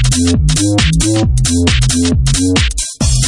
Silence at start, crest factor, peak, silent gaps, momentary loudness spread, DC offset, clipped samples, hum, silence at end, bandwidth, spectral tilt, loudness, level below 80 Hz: 0 s; 12 dB; 0 dBFS; none; 2 LU; under 0.1%; under 0.1%; none; 0 s; 11.5 kHz; -4 dB/octave; -12 LUFS; -18 dBFS